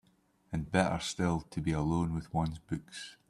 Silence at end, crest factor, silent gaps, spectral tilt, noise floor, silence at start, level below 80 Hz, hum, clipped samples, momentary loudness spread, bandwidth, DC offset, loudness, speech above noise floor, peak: 0.15 s; 20 dB; none; -6 dB/octave; -70 dBFS; 0.5 s; -52 dBFS; none; under 0.1%; 10 LU; 12.5 kHz; under 0.1%; -34 LUFS; 37 dB; -14 dBFS